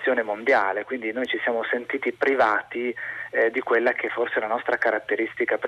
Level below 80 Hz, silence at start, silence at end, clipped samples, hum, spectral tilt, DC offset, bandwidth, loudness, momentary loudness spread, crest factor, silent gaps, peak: -70 dBFS; 0 s; 0 s; under 0.1%; none; -5 dB/octave; under 0.1%; 10.5 kHz; -24 LUFS; 7 LU; 14 dB; none; -10 dBFS